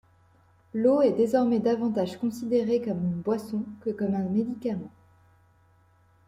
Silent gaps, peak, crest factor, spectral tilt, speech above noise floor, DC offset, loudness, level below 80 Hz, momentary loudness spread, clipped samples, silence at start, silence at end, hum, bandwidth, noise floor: none; -10 dBFS; 16 dB; -8 dB/octave; 36 dB; under 0.1%; -27 LUFS; -68 dBFS; 11 LU; under 0.1%; 0.75 s; 1.4 s; none; 15 kHz; -61 dBFS